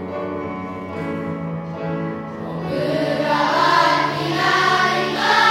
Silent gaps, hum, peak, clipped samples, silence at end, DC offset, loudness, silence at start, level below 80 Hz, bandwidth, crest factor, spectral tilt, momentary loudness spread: none; none; -2 dBFS; under 0.1%; 0 s; under 0.1%; -20 LUFS; 0 s; -58 dBFS; 16 kHz; 18 dB; -4.5 dB/octave; 13 LU